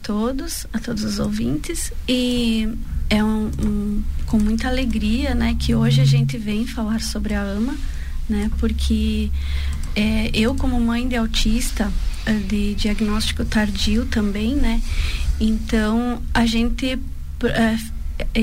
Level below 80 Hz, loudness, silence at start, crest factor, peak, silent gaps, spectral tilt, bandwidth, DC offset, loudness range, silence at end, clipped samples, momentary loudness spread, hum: -24 dBFS; -21 LUFS; 0 s; 12 dB; -6 dBFS; none; -5.5 dB/octave; 16 kHz; 2%; 3 LU; 0 s; under 0.1%; 7 LU; none